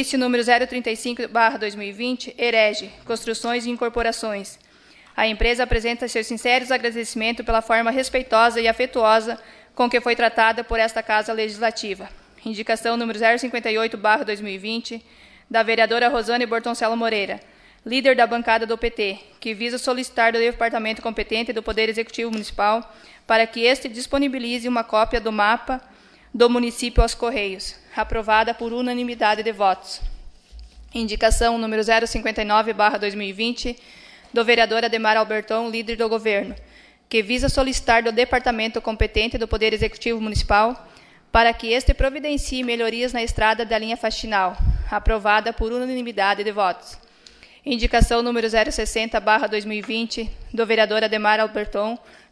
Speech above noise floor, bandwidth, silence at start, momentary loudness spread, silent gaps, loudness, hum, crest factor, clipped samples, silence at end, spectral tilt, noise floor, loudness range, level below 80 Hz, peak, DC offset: 30 dB; 11 kHz; 0 s; 10 LU; none; -21 LUFS; none; 20 dB; under 0.1%; 0.35 s; -4 dB/octave; -51 dBFS; 3 LU; -32 dBFS; -2 dBFS; under 0.1%